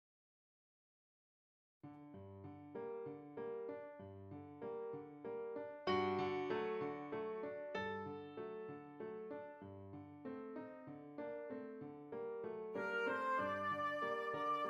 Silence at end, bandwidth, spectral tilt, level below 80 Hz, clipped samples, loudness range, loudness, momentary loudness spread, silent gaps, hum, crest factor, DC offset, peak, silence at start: 0 s; 10.5 kHz; -6.5 dB/octave; -86 dBFS; under 0.1%; 9 LU; -45 LUFS; 15 LU; none; none; 18 dB; under 0.1%; -26 dBFS; 1.85 s